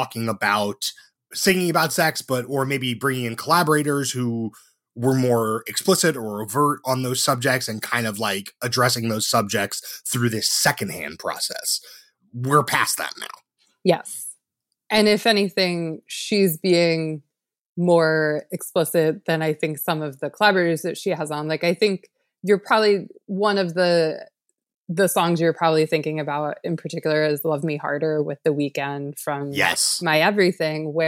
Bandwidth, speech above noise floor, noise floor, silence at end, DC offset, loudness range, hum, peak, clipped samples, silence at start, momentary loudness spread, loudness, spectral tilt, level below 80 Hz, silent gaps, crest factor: 17 kHz; 59 dB; -80 dBFS; 0 s; under 0.1%; 2 LU; none; -4 dBFS; under 0.1%; 0 s; 11 LU; -21 LUFS; -4 dB/octave; -68 dBFS; 17.61-17.76 s, 24.76-24.85 s; 18 dB